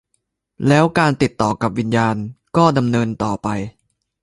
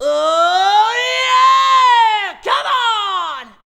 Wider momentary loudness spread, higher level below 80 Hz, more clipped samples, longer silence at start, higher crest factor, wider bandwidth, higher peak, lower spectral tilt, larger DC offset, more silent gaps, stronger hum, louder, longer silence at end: about the same, 9 LU vs 8 LU; first, -46 dBFS vs -60 dBFS; neither; first, 0.6 s vs 0 s; first, 18 dB vs 12 dB; second, 11.5 kHz vs 13.5 kHz; about the same, 0 dBFS vs -2 dBFS; first, -6.5 dB/octave vs 1 dB/octave; neither; neither; neither; second, -18 LUFS vs -13 LUFS; first, 0.5 s vs 0.2 s